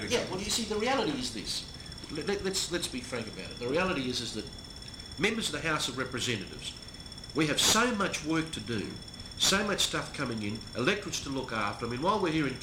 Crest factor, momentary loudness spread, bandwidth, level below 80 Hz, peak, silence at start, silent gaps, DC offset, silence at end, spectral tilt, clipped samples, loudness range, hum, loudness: 20 dB; 14 LU; 16.5 kHz; -52 dBFS; -12 dBFS; 0 s; none; under 0.1%; 0 s; -3 dB/octave; under 0.1%; 5 LU; none; -31 LUFS